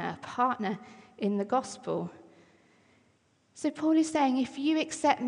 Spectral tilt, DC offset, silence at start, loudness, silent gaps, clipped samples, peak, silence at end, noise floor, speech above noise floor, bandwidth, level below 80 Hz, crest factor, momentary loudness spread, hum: -5 dB/octave; under 0.1%; 0 s; -30 LUFS; none; under 0.1%; -12 dBFS; 0 s; -68 dBFS; 39 dB; 10.5 kHz; -76 dBFS; 18 dB; 9 LU; none